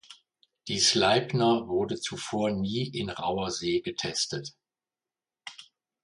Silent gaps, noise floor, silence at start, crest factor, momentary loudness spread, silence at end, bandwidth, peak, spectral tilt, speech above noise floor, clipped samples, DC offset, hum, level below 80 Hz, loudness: none; under -90 dBFS; 0.1 s; 22 dB; 21 LU; 0.4 s; 11.5 kHz; -8 dBFS; -3.5 dB/octave; over 62 dB; under 0.1%; under 0.1%; none; -60 dBFS; -27 LUFS